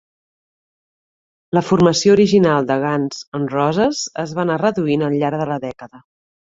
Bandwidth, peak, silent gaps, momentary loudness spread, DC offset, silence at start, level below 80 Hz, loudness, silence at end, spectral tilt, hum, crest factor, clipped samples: 7.8 kHz; -2 dBFS; 3.28-3.32 s; 11 LU; under 0.1%; 1.55 s; -54 dBFS; -17 LUFS; 0.5 s; -5.5 dB/octave; none; 16 dB; under 0.1%